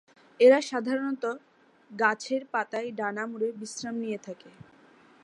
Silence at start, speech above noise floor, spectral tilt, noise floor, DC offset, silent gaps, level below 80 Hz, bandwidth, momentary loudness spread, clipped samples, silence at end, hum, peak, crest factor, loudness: 0.4 s; 30 dB; -4 dB/octave; -57 dBFS; under 0.1%; none; -80 dBFS; 11 kHz; 18 LU; under 0.1%; 0.75 s; none; -8 dBFS; 20 dB; -28 LUFS